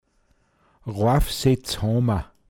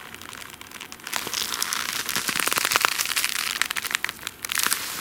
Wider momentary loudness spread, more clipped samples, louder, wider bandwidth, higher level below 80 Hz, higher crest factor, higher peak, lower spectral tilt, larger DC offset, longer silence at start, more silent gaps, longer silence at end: second, 9 LU vs 17 LU; neither; about the same, -22 LUFS vs -24 LUFS; about the same, 18 kHz vs 18 kHz; first, -34 dBFS vs -62 dBFS; second, 18 dB vs 28 dB; second, -6 dBFS vs 0 dBFS; first, -6 dB/octave vs 0.5 dB/octave; neither; first, 0.85 s vs 0 s; neither; first, 0.25 s vs 0 s